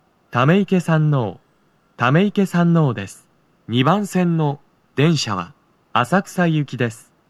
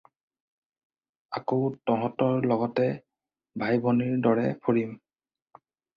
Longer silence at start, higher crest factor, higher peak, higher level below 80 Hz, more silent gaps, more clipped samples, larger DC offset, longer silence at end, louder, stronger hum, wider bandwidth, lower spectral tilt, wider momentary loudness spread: second, 0.3 s vs 1.3 s; about the same, 18 dB vs 18 dB; first, -2 dBFS vs -10 dBFS; about the same, -66 dBFS vs -68 dBFS; neither; neither; neither; second, 0.35 s vs 1 s; first, -19 LUFS vs -27 LUFS; neither; first, 13 kHz vs 5.6 kHz; second, -6.5 dB/octave vs -10 dB/octave; about the same, 11 LU vs 11 LU